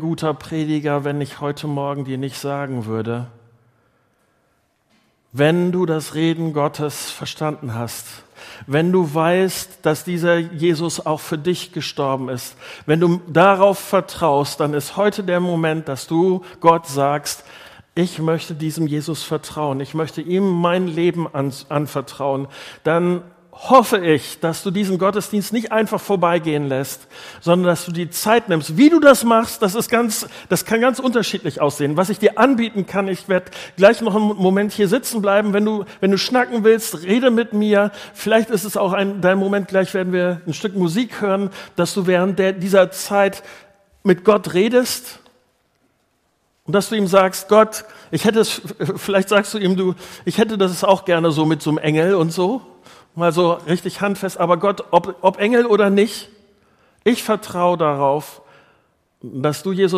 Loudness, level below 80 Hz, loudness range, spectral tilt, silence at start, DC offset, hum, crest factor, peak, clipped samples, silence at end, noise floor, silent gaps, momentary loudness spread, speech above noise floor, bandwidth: -18 LUFS; -60 dBFS; 5 LU; -5.5 dB/octave; 0 s; under 0.1%; none; 18 dB; 0 dBFS; under 0.1%; 0 s; -65 dBFS; none; 10 LU; 47 dB; 15.5 kHz